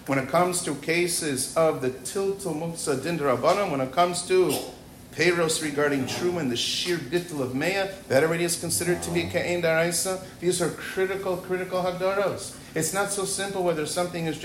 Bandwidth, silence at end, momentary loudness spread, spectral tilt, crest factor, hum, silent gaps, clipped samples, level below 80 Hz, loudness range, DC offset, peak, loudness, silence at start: 16 kHz; 0 s; 7 LU; -3.5 dB/octave; 18 dB; none; none; under 0.1%; -56 dBFS; 3 LU; under 0.1%; -8 dBFS; -25 LUFS; 0 s